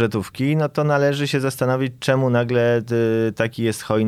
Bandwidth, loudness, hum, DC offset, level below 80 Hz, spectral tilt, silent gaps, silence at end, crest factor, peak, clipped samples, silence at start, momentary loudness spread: 15 kHz; -20 LUFS; none; under 0.1%; -56 dBFS; -6.5 dB/octave; none; 0 s; 14 dB; -4 dBFS; under 0.1%; 0 s; 4 LU